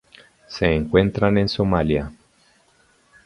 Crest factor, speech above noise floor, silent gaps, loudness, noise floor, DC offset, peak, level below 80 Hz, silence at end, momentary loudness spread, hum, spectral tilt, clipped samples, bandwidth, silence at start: 22 dB; 40 dB; none; -20 LUFS; -59 dBFS; under 0.1%; 0 dBFS; -38 dBFS; 1.15 s; 10 LU; none; -7.5 dB/octave; under 0.1%; 11 kHz; 0.5 s